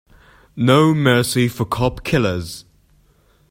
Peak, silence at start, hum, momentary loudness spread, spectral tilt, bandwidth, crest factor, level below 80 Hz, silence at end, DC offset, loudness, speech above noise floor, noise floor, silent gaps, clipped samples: 0 dBFS; 0.55 s; none; 17 LU; -5.5 dB/octave; 16.5 kHz; 18 dB; -42 dBFS; 0.9 s; under 0.1%; -17 LUFS; 39 dB; -56 dBFS; none; under 0.1%